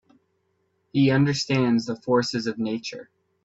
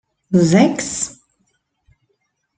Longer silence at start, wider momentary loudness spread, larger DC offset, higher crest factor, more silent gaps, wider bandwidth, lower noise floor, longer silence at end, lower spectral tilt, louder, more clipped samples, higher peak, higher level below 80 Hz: first, 0.95 s vs 0.3 s; about the same, 11 LU vs 11 LU; neither; about the same, 16 dB vs 18 dB; neither; second, 8 kHz vs 9.4 kHz; about the same, -71 dBFS vs -69 dBFS; second, 0.4 s vs 1.45 s; about the same, -6 dB/octave vs -5.5 dB/octave; second, -23 LUFS vs -16 LUFS; neither; second, -8 dBFS vs -2 dBFS; second, -62 dBFS vs -56 dBFS